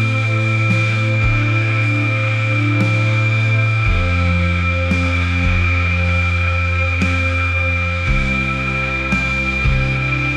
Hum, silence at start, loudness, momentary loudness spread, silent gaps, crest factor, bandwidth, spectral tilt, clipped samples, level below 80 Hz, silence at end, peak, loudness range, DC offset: none; 0 s; -16 LUFS; 2 LU; none; 12 dB; 9.2 kHz; -6.5 dB/octave; under 0.1%; -28 dBFS; 0 s; -4 dBFS; 1 LU; under 0.1%